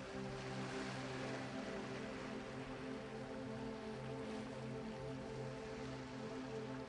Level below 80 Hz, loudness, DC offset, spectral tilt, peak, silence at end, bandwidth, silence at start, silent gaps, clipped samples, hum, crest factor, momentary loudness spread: -66 dBFS; -47 LUFS; under 0.1%; -5.5 dB/octave; -32 dBFS; 0 s; 11 kHz; 0 s; none; under 0.1%; none; 14 dB; 3 LU